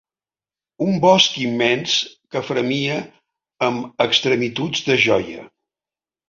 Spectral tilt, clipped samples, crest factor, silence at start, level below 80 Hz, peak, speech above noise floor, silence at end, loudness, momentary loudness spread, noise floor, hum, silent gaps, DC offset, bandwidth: -4 dB/octave; under 0.1%; 20 dB; 0.8 s; -60 dBFS; 0 dBFS; over 71 dB; 0.85 s; -18 LUFS; 11 LU; under -90 dBFS; none; none; under 0.1%; 7.6 kHz